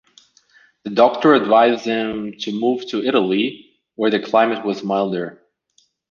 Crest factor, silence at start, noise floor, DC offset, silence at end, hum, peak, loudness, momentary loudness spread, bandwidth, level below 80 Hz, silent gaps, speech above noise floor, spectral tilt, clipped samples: 18 dB; 0.85 s; -62 dBFS; under 0.1%; 0.8 s; none; -2 dBFS; -18 LUFS; 12 LU; 7.2 kHz; -64 dBFS; none; 44 dB; -6 dB/octave; under 0.1%